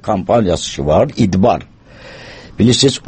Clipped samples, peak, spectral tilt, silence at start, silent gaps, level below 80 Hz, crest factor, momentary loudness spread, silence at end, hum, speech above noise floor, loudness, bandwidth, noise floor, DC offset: under 0.1%; 0 dBFS; -5.5 dB/octave; 0.05 s; none; -36 dBFS; 14 dB; 22 LU; 0.1 s; none; 24 dB; -14 LUFS; 8.8 kHz; -37 dBFS; under 0.1%